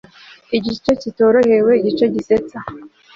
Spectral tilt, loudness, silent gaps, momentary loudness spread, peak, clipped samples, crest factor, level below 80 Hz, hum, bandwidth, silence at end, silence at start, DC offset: -6.5 dB/octave; -16 LUFS; none; 14 LU; -2 dBFS; under 0.1%; 14 dB; -50 dBFS; none; 7.4 kHz; 0.3 s; 0.5 s; under 0.1%